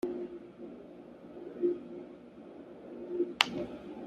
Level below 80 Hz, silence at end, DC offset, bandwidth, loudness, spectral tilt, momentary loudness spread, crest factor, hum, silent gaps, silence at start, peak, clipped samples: -70 dBFS; 0 s; under 0.1%; 13.5 kHz; -35 LUFS; -3.5 dB/octave; 21 LU; 36 dB; none; none; 0.05 s; -2 dBFS; under 0.1%